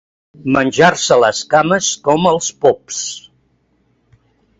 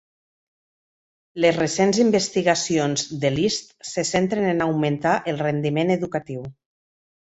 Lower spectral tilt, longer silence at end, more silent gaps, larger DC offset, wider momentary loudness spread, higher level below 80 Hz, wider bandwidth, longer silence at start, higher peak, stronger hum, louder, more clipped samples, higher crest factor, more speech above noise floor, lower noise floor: about the same, -3.5 dB/octave vs -4.5 dB/octave; first, 1.4 s vs 0.9 s; neither; neither; about the same, 11 LU vs 10 LU; first, -52 dBFS vs -58 dBFS; about the same, 8 kHz vs 8.2 kHz; second, 0.4 s vs 1.35 s; first, 0 dBFS vs -4 dBFS; neither; first, -14 LUFS vs -22 LUFS; neither; about the same, 16 dB vs 18 dB; second, 46 dB vs over 69 dB; second, -60 dBFS vs under -90 dBFS